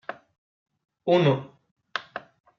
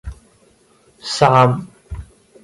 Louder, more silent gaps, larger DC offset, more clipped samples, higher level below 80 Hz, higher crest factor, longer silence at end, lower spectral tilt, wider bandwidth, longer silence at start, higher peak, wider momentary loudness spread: second, -25 LUFS vs -15 LUFS; first, 0.38-0.66 s, 1.71-1.76 s vs none; neither; neither; second, -72 dBFS vs -40 dBFS; about the same, 20 dB vs 20 dB; about the same, 0.4 s vs 0.4 s; about the same, -5.5 dB/octave vs -5.5 dB/octave; second, 7.2 kHz vs 11.5 kHz; about the same, 0.1 s vs 0.05 s; second, -8 dBFS vs 0 dBFS; second, 20 LU vs 23 LU